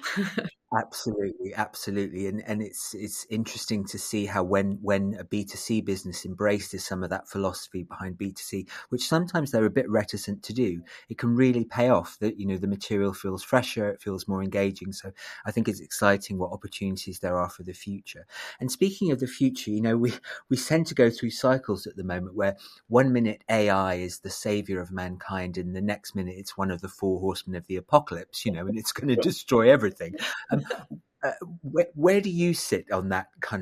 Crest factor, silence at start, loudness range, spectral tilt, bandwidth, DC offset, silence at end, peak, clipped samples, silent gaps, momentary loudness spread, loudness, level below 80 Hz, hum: 24 dB; 0 s; 6 LU; -5.5 dB/octave; 15 kHz; under 0.1%; 0 s; -4 dBFS; under 0.1%; none; 12 LU; -27 LUFS; -64 dBFS; none